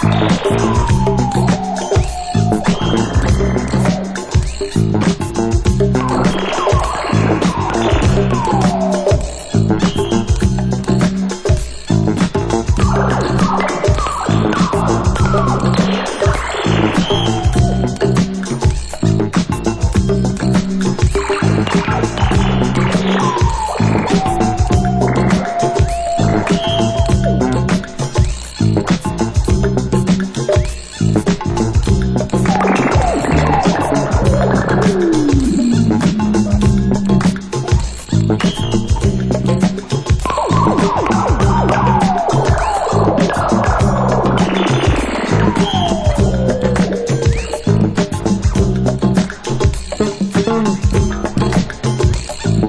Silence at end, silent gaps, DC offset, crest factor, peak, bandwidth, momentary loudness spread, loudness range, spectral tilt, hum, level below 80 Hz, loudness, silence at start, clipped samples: 0 s; none; under 0.1%; 12 dB; -2 dBFS; 11 kHz; 4 LU; 2 LU; -6 dB/octave; none; -24 dBFS; -15 LUFS; 0 s; under 0.1%